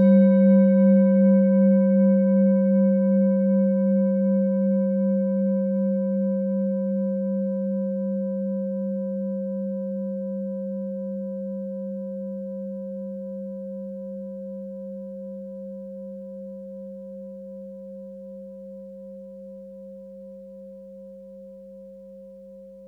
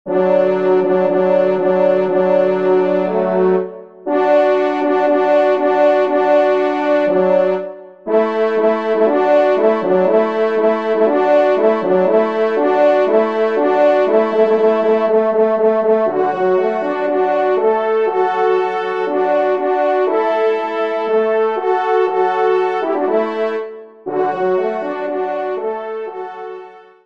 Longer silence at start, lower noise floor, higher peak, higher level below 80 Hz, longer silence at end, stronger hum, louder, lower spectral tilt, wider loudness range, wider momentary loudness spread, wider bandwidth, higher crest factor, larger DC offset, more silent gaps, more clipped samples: about the same, 0 s vs 0.05 s; first, -44 dBFS vs -36 dBFS; second, -8 dBFS vs -2 dBFS; about the same, -68 dBFS vs -68 dBFS; second, 0 s vs 0.25 s; first, 50 Hz at -70 dBFS vs none; second, -22 LUFS vs -15 LUFS; first, -13 dB/octave vs -7.5 dB/octave; first, 22 LU vs 3 LU; first, 24 LU vs 8 LU; second, 2.3 kHz vs 6.6 kHz; about the same, 16 dB vs 14 dB; second, under 0.1% vs 0.3%; neither; neither